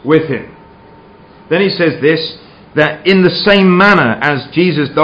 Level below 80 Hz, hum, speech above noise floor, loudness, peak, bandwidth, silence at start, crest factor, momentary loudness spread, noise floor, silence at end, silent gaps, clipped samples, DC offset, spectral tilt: -48 dBFS; none; 28 dB; -11 LUFS; 0 dBFS; 7.8 kHz; 0.05 s; 12 dB; 10 LU; -39 dBFS; 0 s; none; 0.3%; under 0.1%; -7.5 dB/octave